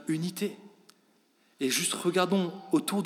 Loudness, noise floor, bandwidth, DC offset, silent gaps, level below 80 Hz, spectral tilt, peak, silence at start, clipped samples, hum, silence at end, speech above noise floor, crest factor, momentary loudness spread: -29 LUFS; -67 dBFS; 16.5 kHz; under 0.1%; none; under -90 dBFS; -4 dB/octave; -12 dBFS; 0 s; under 0.1%; none; 0 s; 38 dB; 18 dB; 9 LU